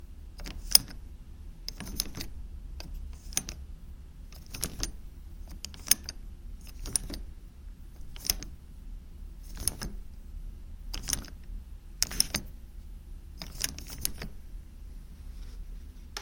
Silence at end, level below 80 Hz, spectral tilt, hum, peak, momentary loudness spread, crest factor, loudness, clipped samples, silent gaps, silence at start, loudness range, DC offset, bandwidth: 0 s; -42 dBFS; -1 dB/octave; none; 0 dBFS; 22 LU; 36 dB; -32 LUFS; under 0.1%; none; 0 s; 8 LU; under 0.1%; 17 kHz